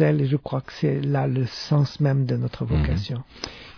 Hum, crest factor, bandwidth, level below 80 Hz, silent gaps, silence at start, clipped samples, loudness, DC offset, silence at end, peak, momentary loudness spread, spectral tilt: none; 14 dB; 5.4 kHz; -36 dBFS; none; 0 s; under 0.1%; -24 LUFS; under 0.1%; 0.05 s; -8 dBFS; 10 LU; -8 dB/octave